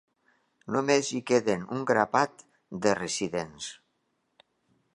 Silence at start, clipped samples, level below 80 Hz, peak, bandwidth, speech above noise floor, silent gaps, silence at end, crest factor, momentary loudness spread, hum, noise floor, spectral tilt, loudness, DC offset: 0.65 s; under 0.1%; -66 dBFS; -6 dBFS; 11 kHz; 48 dB; none; 1.2 s; 22 dB; 15 LU; none; -76 dBFS; -4 dB/octave; -28 LUFS; under 0.1%